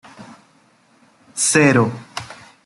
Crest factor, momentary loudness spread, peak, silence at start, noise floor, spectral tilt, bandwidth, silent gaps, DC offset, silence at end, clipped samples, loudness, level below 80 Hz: 20 dB; 19 LU; -2 dBFS; 0.2 s; -55 dBFS; -4 dB/octave; 12.5 kHz; none; under 0.1%; 0.3 s; under 0.1%; -15 LUFS; -62 dBFS